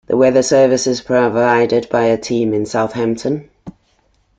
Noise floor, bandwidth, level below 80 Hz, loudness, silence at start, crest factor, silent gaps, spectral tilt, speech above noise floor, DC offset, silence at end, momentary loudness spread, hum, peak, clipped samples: -58 dBFS; 9.2 kHz; -52 dBFS; -15 LUFS; 0.1 s; 14 dB; none; -5 dB/octave; 44 dB; under 0.1%; 0.7 s; 7 LU; none; -2 dBFS; under 0.1%